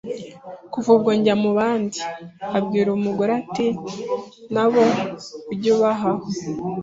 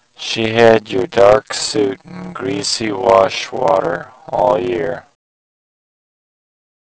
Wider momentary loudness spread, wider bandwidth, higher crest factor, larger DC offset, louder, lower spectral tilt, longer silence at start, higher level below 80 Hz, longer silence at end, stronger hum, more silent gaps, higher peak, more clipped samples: about the same, 15 LU vs 13 LU; about the same, 7.8 kHz vs 8 kHz; about the same, 16 dB vs 16 dB; neither; second, -21 LUFS vs -15 LUFS; first, -6 dB/octave vs -4 dB/octave; second, 0.05 s vs 0.2 s; second, -60 dBFS vs -50 dBFS; second, 0 s vs 1.85 s; neither; neither; second, -4 dBFS vs 0 dBFS; second, under 0.1% vs 0.4%